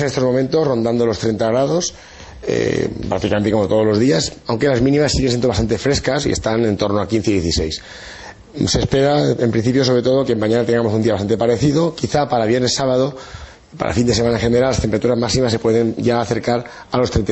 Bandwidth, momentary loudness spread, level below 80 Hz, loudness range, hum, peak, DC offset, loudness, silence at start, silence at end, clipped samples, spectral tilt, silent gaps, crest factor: 8.4 kHz; 7 LU; -36 dBFS; 2 LU; none; -4 dBFS; under 0.1%; -17 LUFS; 0 s; 0 s; under 0.1%; -5.5 dB/octave; none; 14 dB